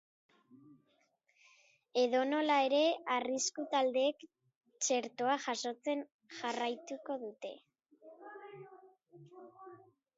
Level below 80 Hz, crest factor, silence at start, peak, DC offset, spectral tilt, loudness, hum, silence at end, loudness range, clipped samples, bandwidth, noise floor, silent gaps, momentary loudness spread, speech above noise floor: under -90 dBFS; 18 dB; 0.55 s; -18 dBFS; under 0.1%; -0.5 dB/octave; -35 LUFS; none; 0.4 s; 11 LU; under 0.1%; 7.6 kHz; -76 dBFS; 4.56-4.61 s, 6.12-6.19 s; 24 LU; 41 dB